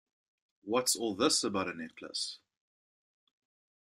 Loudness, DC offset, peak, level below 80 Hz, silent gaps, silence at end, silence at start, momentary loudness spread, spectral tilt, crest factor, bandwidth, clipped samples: -32 LUFS; under 0.1%; -16 dBFS; -78 dBFS; none; 1.5 s; 0.65 s; 15 LU; -2 dB/octave; 20 dB; 13.5 kHz; under 0.1%